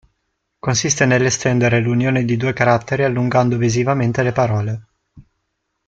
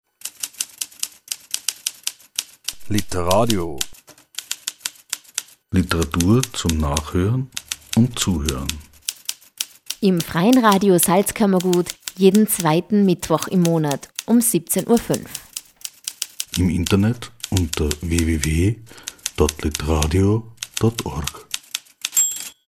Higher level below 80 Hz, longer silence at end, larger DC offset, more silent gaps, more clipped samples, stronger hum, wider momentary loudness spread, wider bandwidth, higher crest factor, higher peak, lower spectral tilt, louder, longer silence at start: second, -50 dBFS vs -36 dBFS; first, 0.65 s vs 0.15 s; neither; neither; neither; neither; second, 5 LU vs 13 LU; second, 7.8 kHz vs 19.5 kHz; about the same, 16 dB vs 20 dB; about the same, -2 dBFS vs 0 dBFS; about the same, -5 dB/octave vs -4.5 dB/octave; first, -17 LUFS vs -20 LUFS; first, 0.65 s vs 0.25 s